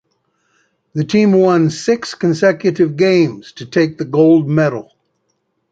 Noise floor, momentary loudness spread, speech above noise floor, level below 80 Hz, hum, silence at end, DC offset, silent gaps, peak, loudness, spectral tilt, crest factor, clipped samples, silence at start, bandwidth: -67 dBFS; 9 LU; 54 dB; -58 dBFS; none; 0.9 s; under 0.1%; none; -2 dBFS; -14 LUFS; -6.5 dB/octave; 14 dB; under 0.1%; 0.95 s; 8.8 kHz